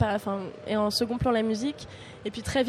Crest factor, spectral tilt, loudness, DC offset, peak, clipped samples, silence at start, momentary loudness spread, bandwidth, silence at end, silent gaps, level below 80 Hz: 16 dB; -5.5 dB/octave; -28 LUFS; under 0.1%; -12 dBFS; under 0.1%; 0 s; 12 LU; 14 kHz; 0 s; none; -50 dBFS